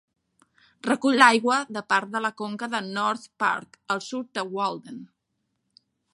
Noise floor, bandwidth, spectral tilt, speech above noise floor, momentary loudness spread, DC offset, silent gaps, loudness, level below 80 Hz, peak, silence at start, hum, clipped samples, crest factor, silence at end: -77 dBFS; 11.5 kHz; -3.5 dB/octave; 53 dB; 15 LU; under 0.1%; none; -24 LUFS; -78 dBFS; 0 dBFS; 0.85 s; none; under 0.1%; 26 dB; 1.1 s